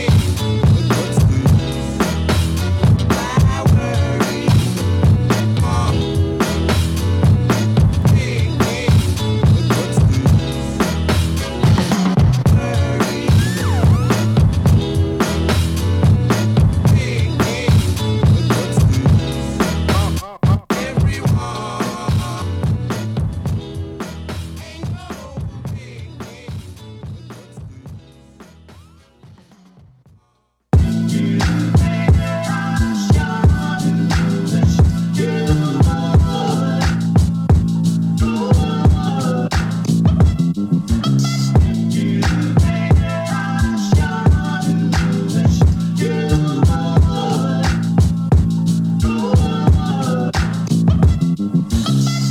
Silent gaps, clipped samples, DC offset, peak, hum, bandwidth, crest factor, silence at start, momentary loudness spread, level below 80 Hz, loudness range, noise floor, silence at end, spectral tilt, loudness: none; under 0.1%; under 0.1%; -2 dBFS; none; 15.5 kHz; 14 dB; 0 s; 8 LU; -24 dBFS; 8 LU; -63 dBFS; 0 s; -6.5 dB/octave; -16 LUFS